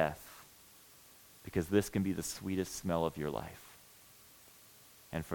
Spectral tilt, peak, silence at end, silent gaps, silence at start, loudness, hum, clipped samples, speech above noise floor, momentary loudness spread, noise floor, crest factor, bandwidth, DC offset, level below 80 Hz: -5.5 dB/octave; -16 dBFS; 0 s; none; 0 s; -36 LUFS; none; under 0.1%; 24 dB; 24 LU; -60 dBFS; 24 dB; 18 kHz; under 0.1%; -62 dBFS